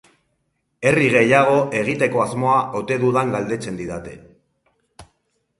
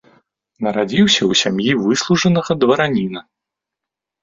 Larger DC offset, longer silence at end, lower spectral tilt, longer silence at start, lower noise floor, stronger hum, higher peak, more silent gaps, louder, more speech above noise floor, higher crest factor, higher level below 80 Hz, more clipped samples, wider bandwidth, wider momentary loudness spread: neither; second, 0.55 s vs 1 s; first, -6 dB/octave vs -4.5 dB/octave; first, 0.8 s vs 0.6 s; second, -71 dBFS vs -84 dBFS; neither; about the same, 0 dBFS vs -2 dBFS; neither; about the same, -18 LUFS vs -16 LUFS; second, 52 dB vs 68 dB; about the same, 20 dB vs 16 dB; about the same, -54 dBFS vs -54 dBFS; neither; first, 11.5 kHz vs 7.8 kHz; first, 14 LU vs 9 LU